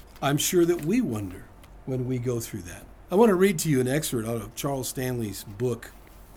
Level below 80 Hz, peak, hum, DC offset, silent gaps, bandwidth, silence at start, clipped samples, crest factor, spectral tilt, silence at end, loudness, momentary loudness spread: -50 dBFS; -6 dBFS; none; under 0.1%; none; over 20 kHz; 0.05 s; under 0.1%; 20 dB; -5 dB/octave; 0.05 s; -26 LUFS; 17 LU